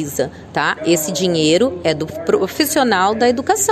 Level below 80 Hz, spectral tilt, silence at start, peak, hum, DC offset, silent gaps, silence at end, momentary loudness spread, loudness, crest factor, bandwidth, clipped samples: -46 dBFS; -3.5 dB/octave; 0 s; -2 dBFS; none; under 0.1%; none; 0 s; 7 LU; -16 LUFS; 14 dB; 14.5 kHz; under 0.1%